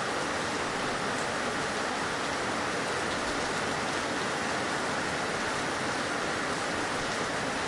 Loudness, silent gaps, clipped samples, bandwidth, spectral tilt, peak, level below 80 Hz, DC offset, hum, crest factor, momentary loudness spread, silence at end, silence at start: -30 LUFS; none; under 0.1%; 11.5 kHz; -3 dB/octave; -18 dBFS; -56 dBFS; under 0.1%; none; 12 dB; 0 LU; 0 s; 0 s